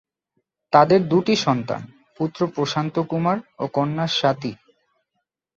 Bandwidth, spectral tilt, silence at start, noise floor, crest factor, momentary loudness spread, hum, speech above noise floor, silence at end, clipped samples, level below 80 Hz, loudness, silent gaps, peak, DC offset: 7.8 kHz; -6 dB/octave; 0.7 s; -78 dBFS; 20 dB; 12 LU; none; 57 dB; 1.05 s; under 0.1%; -62 dBFS; -21 LUFS; none; -2 dBFS; under 0.1%